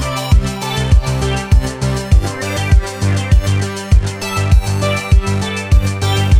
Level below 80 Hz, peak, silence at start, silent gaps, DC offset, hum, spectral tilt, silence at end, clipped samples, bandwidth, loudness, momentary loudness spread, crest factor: -16 dBFS; 0 dBFS; 0 s; none; under 0.1%; none; -5.5 dB/octave; 0 s; under 0.1%; 16 kHz; -15 LUFS; 5 LU; 12 dB